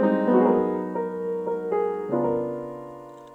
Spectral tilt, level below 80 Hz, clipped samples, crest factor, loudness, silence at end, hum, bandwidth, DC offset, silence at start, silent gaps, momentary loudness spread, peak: -9.5 dB/octave; -62 dBFS; under 0.1%; 16 dB; -25 LUFS; 0 s; none; 7.6 kHz; under 0.1%; 0 s; none; 17 LU; -8 dBFS